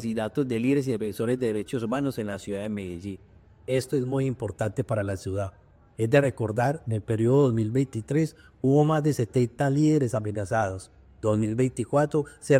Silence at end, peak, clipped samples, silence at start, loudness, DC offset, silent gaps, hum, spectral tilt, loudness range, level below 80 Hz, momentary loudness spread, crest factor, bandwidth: 0 s; -8 dBFS; under 0.1%; 0 s; -26 LUFS; under 0.1%; none; none; -7.5 dB/octave; 6 LU; -58 dBFS; 10 LU; 18 dB; 15.5 kHz